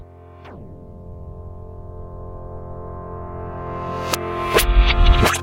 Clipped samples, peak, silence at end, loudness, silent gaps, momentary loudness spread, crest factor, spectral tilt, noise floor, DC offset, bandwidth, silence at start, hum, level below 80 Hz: under 0.1%; 0 dBFS; 0 s; -20 LUFS; none; 23 LU; 20 dB; -4 dB/octave; -41 dBFS; under 0.1%; 16.5 kHz; 0 s; none; -22 dBFS